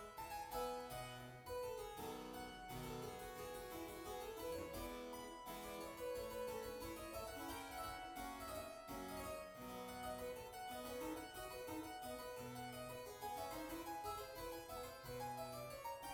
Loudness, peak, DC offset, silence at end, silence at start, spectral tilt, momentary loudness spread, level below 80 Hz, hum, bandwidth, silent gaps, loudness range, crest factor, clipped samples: -50 LUFS; -34 dBFS; under 0.1%; 0 s; 0 s; -4 dB/octave; 4 LU; -66 dBFS; none; over 20 kHz; none; 1 LU; 16 dB; under 0.1%